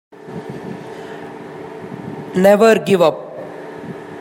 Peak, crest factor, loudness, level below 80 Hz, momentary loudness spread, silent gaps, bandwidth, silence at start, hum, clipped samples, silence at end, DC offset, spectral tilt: -2 dBFS; 18 dB; -13 LUFS; -64 dBFS; 20 LU; none; 16 kHz; 0.25 s; none; under 0.1%; 0 s; under 0.1%; -6 dB/octave